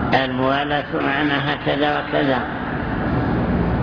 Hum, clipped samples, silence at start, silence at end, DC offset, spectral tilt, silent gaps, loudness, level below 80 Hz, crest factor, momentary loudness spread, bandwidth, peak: none; under 0.1%; 0 s; 0 s; under 0.1%; -8 dB/octave; none; -20 LUFS; -34 dBFS; 16 dB; 4 LU; 5.4 kHz; -4 dBFS